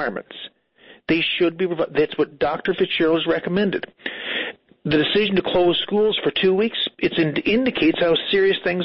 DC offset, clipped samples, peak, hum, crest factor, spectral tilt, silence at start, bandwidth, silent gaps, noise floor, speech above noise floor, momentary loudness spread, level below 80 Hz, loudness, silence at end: under 0.1%; under 0.1%; -8 dBFS; none; 12 dB; -9.5 dB/octave; 0 s; 5.8 kHz; none; -50 dBFS; 30 dB; 11 LU; -52 dBFS; -20 LUFS; 0 s